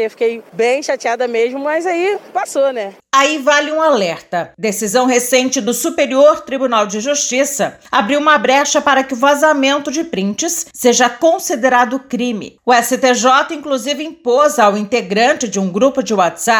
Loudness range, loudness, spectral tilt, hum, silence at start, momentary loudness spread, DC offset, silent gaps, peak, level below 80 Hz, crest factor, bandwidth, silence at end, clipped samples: 2 LU; -14 LUFS; -2.5 dB/octave; none; 0 s; 8 LU; under 0.1%; none; 0 dBFS; -60 dBFS; 14 dB; over 20 kHz; 0 s; under 0.1%